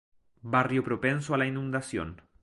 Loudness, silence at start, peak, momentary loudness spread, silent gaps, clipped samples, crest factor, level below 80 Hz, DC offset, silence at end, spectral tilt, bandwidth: -29 LUFS; 0.45 s; -10 dBFS; 10 LU; none; under 0.1%; 20 dB; -56 dBFS; under 0.1%; 0.25 s; -6.5 dB/octave; 11.5 kHz